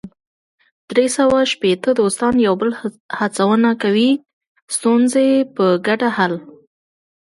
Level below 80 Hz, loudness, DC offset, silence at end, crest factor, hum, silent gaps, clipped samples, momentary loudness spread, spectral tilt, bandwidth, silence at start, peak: -56 dBFS; -16 LUFS; under 0.1%; 0.8 s; 16 dB; none; 0.27-0.58 s, 0.72-0.88 s, 3.00-3.09 s, 4.33-4.41 s, 4.47-4.55 s, 4.62-4.68 s; under 0.1%; 7 LU; -4.5 dB/octave; 11.5 kHz; 0.05 s; 0 dBFS